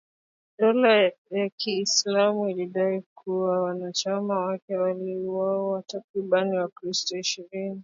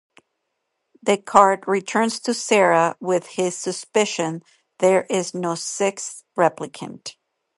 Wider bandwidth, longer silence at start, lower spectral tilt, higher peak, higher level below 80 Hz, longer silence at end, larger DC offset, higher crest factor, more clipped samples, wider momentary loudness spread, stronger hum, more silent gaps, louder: second, 7.8 kHz vs 11.5 kHz; second, 0.6 s vs 1.05 s; about the same, -3.5 dB/octave vs -3.5 dB/octave; second, -8 dBFS vs 0 dBFS; second, -78 dBFS vs -70 dBFS; second, 0 s vs 0.45 s; neither; about the same, 18 dB vs 22 dB; neither; second, 10 LU vs 17 LU; neither; first, 1.18-1.25 s, 1.52-1.58 s, 3.06-3.16 s, 4.62-4.68 s, 6.04-6.14 s, 6.72-6.76 s vs none; second, -25 LUFS vs -20 LUFS